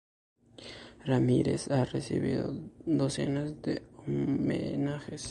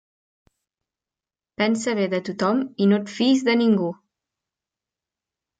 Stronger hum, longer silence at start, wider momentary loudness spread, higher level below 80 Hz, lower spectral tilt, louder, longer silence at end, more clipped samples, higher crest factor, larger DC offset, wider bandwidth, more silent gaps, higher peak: neither; second, 0.6 s vs 1.6 s; first, 13 LU vs 6 LU; first, -56 dBFS vs -72 dBFS; about the same, -6.5 dB/octave vs -5.5 dB/octave; second, -31 LUFS vs -21 LUFS; second, 0 s vs 1.65 s; neither; about the same, 18 dB vs 16 dB; neither; first, 11.5 kHz vs 9.2 kHz; neither; second, -14 dBFS vs -8 dBFS